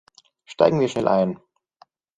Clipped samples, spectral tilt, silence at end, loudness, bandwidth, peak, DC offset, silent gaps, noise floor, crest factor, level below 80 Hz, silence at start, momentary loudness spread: under 0.1%; -7 dB/octave; 0.8 s; -21 LUFS; 9.4 kHz; -2 dBFS; under 0.1%; none; -57 dBFS; 22 dB; -60 dBFS; 0.5 s; 19 LU